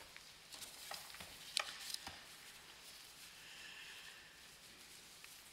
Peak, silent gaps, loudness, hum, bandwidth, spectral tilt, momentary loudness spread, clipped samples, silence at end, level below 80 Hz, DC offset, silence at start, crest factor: -16 dBFS; none; -50 LUFS; none; 16 kHz; 0 dB/octave; 14 LU; under 0.1%; 0 s; -78 dBFS; under 0.1%; 0 s; 38 dB